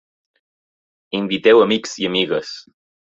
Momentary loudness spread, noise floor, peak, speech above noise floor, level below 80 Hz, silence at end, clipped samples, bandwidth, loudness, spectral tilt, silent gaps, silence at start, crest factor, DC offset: 16 LU; under -90 dBFS; -2 dBFS; over 73 dB; -62 dBFS; 0.45 s; under 0.1%; 7.8 kHz; -17 LUFS; -4.5 dB/octave; none; 1.15 s; 18 dB; under 0.1%